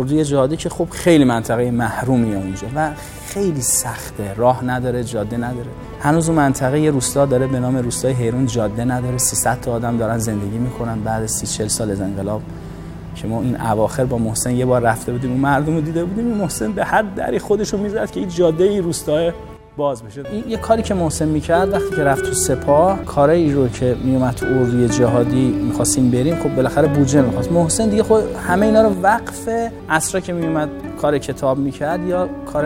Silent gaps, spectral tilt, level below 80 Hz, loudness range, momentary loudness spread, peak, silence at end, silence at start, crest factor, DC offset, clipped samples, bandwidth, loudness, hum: none; -5.5 dB/octave; -38 dBFS; 4 LU; 8 LU; 0 dBFS; 0 s; 0 s; 16 dB; under 0.1%; under 0.1%; 16.5 kHz; -18 LUFS; none